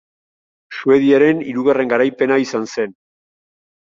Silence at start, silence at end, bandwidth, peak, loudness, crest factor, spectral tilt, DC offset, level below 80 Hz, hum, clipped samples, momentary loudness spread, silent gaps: 0.7 s; 1.05 s; 7.6 kHz; -2 dBFS; -16 LUFS; 16 dB; -6 dB/octave; under 0.1%; -62 dBFS; none; under 0.1%; 11 LU; none